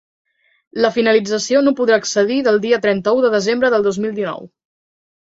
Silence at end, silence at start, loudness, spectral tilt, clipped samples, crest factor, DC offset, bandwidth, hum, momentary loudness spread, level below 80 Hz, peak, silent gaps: 0.75 s; 0.75 s; -16 LUFS; -4 dB/octave; under 0.1%; 14 dB; under 0.1%; 8 kHz; none; 8 LU; -60 dBFS; -2 dBFS; none